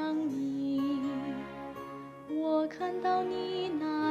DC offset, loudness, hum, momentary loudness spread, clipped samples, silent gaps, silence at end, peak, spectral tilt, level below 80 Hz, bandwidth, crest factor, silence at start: under 0.1%; -33 LUFS; none; 12 LU; under 0.1%; none; 0 s; -20 dBFS; -6.5 dB/octave; -68 dBFS; 13 kHz; 14 dB; 0 s